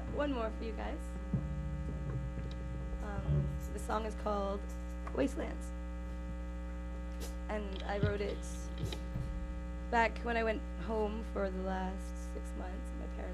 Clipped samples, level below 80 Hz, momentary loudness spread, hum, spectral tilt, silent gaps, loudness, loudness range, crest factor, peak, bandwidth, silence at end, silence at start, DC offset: under 0.1%; -42 dBFS; 9 LU; 60 Hz at -40 dBFS; -6.5 dB/octave; none; -39 LUFS; 4 LU; 20 dB; -18 dBFS; 13 kHz; 0 s; 0 s; under 0.1%